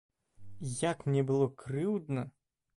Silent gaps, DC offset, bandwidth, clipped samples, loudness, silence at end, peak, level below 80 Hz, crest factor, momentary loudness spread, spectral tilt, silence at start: none; under 0.1%; 11.5 kHz; under 0.1%; -33 LUFS; 0.45 s; -18 dBFS; -66 dBFS; 16 dB; 10 LU; -6.5 dB/octave; 0.4 s